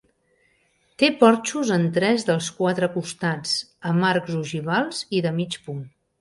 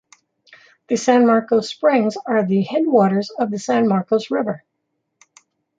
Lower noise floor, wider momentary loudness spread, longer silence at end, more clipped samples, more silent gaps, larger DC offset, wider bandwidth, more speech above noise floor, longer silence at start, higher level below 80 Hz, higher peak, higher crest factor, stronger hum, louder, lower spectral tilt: second, -65 dBFS vs -74 dBFS; about the same, 10 LU vs 9 LU; second, 0.3 s vs 1.2 s; neither; neither; neither; first, 11.5 kHz vs 9 kHz; second, 43 dB vs 57 dB; about the same, 1 s vs 0.9 s; about the same, -66 dBFS vs -70 dBFS; about the same, -2 dBFS vs -2 dBFS; about the same, 20 dB vs 16 dB; neither; second, -22 LUFS vs -18 LUFS; about the same, -5 dB/octave vs -6 dB/octave